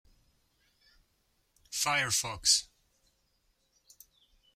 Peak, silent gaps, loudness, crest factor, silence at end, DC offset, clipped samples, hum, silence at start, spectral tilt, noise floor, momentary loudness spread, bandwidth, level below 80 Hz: -10 dBFS; none; -28 LUFS; 28 dB; 1.9 s; under 0.1%; under 0.1%; none; 1.7 s; 0 dB/octave; -74 dBFS; 7 LU; 16.5 kHz; -64 dBFS